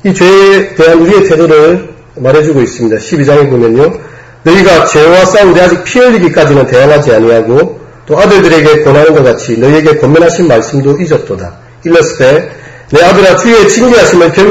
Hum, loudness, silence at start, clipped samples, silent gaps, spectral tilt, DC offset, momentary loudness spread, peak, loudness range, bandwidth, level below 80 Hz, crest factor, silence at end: none; -5 LUFS; 0.05 s; 7%; none; -5.5 dB/octave; 0.3%; 7 LU; 0 dBFS; 3 LU; 12 kHz; -34 dBFS; 4 dB; 0 s